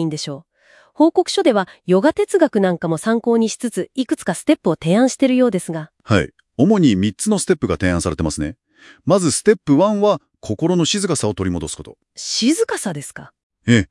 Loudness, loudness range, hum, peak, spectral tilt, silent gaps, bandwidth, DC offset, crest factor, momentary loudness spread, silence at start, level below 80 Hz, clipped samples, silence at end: -18 LUFS; 2 LU; none; 0 dBFS; -5 dB/octave; 13.43-13.50 s; 12 kHz; under 0.1%; 18 dB; 13 LU; 0 s; -48 dBFS; under 0.1%; 0.05 s